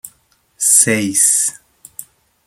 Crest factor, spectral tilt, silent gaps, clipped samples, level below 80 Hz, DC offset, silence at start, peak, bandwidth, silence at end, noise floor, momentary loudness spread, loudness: 18 dB; -2 dB/octave; none; under 0.1%; -62 dBFS; under 0.1%; 0.05 s; 0 dBFS; over 20 kHz; 0.45 s; -57 dBFS; 20 LU; -12 LUFS